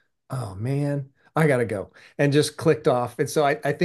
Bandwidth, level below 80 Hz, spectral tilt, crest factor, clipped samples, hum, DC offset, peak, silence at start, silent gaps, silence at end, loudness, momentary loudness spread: 12.5 kHz; -66 dBFS; -6 dB/octave; 18 dB; under 0.1%; none; under 0.1%; -6 dBFS; 0.3 s; none; 0 s; -24 LUFS; 12 LU